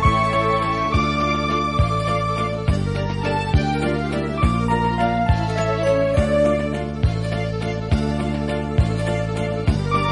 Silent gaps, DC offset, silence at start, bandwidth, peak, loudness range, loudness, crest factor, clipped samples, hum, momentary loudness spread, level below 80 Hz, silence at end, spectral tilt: none; under 0.1%; 0 s; 11 kHz; -4 dBFS; 2 LU; -21 LUFS; 16 dB; under 0.1%; none; 5 LU; -30 dBFS; 0 s; -7 dB/octave